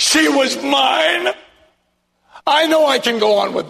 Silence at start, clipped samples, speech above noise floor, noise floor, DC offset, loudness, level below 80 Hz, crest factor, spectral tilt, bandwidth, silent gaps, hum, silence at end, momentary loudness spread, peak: 0 s; under 0.1%; 51 dB; -65 dBFS; under 0.1%; -14 LUFS; -60 dBFS; 14 dB; -1.5 dB/octave; 13.5 kHz; none; none; 0 s; 8 LU; -2 dBFS